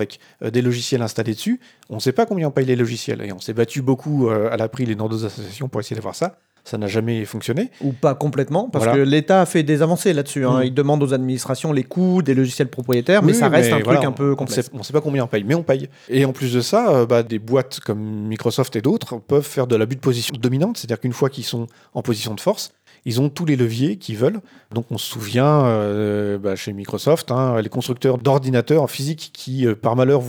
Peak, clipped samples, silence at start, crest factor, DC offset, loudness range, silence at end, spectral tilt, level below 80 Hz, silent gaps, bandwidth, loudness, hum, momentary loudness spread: 0 dBFS; under 0.1%; 0 s; 18 dB; under 0.1%; 5 LU; 0 s; -6 dB/octave; -68 dBFS; none; over 20 kHz; -20 LUFS; none; 11 LU